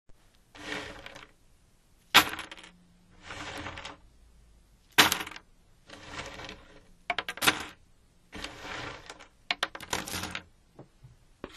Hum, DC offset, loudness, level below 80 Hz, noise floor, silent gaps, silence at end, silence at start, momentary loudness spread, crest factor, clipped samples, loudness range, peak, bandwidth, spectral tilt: none; under 0.1%; -29 LUFS; -58 dBFS; -62 dBFS; none; 0 s; 0.1 s; 26 LU; 34 dB; under 0.1%; 8 LU; 0 dBFS; 13.5 kHz; -1 dB/octave